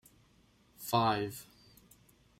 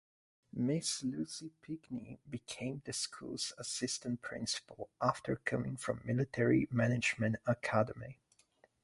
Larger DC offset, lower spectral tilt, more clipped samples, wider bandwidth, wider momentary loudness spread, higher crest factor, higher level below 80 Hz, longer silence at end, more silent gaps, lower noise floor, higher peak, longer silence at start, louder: neither; about the same, -5 dB/octave vs -4.5 dB/octave; neither; first, 16 kHz vs 11.5 kHz; first, 20 LU vs 15 LU; about the same, 22 dB vs 20 dB; about the same, -68 dBFS vs -66 dBFS; first, 0.95 s vs 0.7 s; neither; second, -67 dBFS vs -71 dBFS; about the same, -16 dBFS vs -16 dBFS; first, 0.8 s vs 0.55 s; first, -33 LUFS vs -37 LUFS